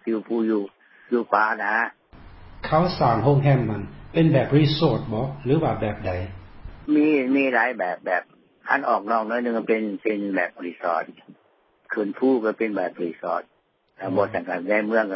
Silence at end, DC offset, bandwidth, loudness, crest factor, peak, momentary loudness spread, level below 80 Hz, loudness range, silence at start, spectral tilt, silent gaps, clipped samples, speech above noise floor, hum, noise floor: 0 s; under 0.1%; 5.8 kHz; -23 LUFS; 20 dB; -4 dBFS; 10 LU; -48 dBFS; 5 LU; 0.05 s; -11.5 dB/octave; none; under 0.1%; 37 dB; none; -59 dBFS